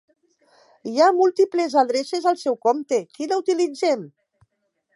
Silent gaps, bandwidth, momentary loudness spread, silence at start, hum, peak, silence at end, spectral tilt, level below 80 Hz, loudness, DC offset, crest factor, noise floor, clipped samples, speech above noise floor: none; 11.5 kHz; 8 LU; 0.85 s; none; -4 dBFS; 0.85 s; -4 dB/octave; -80 dBFS; -21 LUFS; under 0.1%; 18 dB; -72 dBFS; under 0.1%; 52 dB